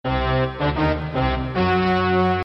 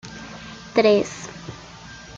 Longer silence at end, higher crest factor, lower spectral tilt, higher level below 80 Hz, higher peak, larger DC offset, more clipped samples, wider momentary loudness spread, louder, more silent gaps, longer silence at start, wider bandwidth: about the same, 0 s vs 0 s; second, 10 dB vs 22 dB; first, -8.5 dB/octave vs -4.5 dB/octave; first, -32 dBFS vs -54 dBFS; second, -10 dBFS vs -2 dBFS; neither; neither; second, 4 LU vs 22 LU; about the same, -21 LUFS vs -20 LUFS; neither; about the same, 0.05 s vs 0.05 s; second, 6 kHz vs 7.8 kHz